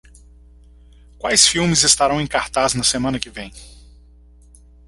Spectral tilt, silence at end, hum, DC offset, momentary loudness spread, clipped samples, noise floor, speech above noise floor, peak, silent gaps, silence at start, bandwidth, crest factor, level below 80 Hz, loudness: -2 dB/octave; 1.2 s; 60 Hz at -40 dBFS; under 0.1%; 16 LU; under 0.1%; -47 dBFS; 29 dB; 0 dBFS; none; 1.25 s; 12 kHz; 20 dB; -42 dBFS; -16 LUFS